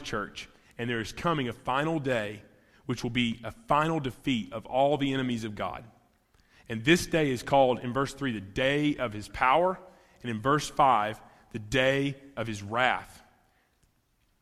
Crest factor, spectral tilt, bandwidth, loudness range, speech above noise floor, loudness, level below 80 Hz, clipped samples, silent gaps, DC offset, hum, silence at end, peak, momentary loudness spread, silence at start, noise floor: 22 dB; -5 dB/octave; 15 kHz; 4 LU; 42 dB; -28 LUFS; -54 dBFS; under 0.1%; none; under 0.1%; none; 1.25 s; -8 dBFS; 15 LU; 0 s; -70 dBFS